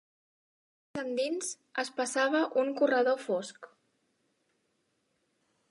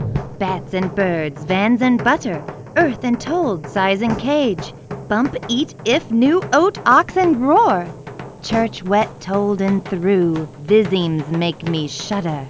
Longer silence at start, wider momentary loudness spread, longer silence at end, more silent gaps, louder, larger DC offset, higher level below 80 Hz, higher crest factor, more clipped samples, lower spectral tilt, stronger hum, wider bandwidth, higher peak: first, 0.95 s vs 0 s; about the same, 10 LU vs 9 LU; first, 2.05 s vs 0 s; neither; second, -30 LUFS vs -18 LUFS; neither; second, -84 dBFS vs -46 dBFS; about the same, 18 dB vs 18 dB; neither; second, -2.5 dB/octave vs -6 dB/octave; neither; first, 11.5 kHz vs 8 kHz; second, -16 dBFS vs 0 dBFS